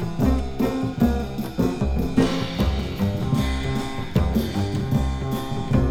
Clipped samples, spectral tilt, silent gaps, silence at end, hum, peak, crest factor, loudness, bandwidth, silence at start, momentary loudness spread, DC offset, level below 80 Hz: under 0.1%; -7 dB/octave; none; 0 s; none; -6 dBFS; 16 dB; -24 LUFS; 17 kHz; 0 s; 5 LU; under 0.1%; -30 dBFS